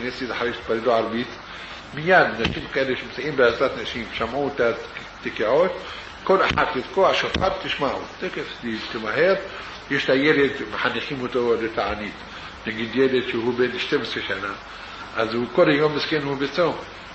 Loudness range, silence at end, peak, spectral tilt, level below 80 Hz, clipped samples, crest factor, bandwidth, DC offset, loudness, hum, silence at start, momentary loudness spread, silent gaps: 2 LU; 0 s; -4 dBFS; -5.5 dB/octave; -48 dBFS; under 0.1%; 20 dB; 8.4 kHz; under 0.1%; -22 LUFS; none; 0 s; 14 LU; none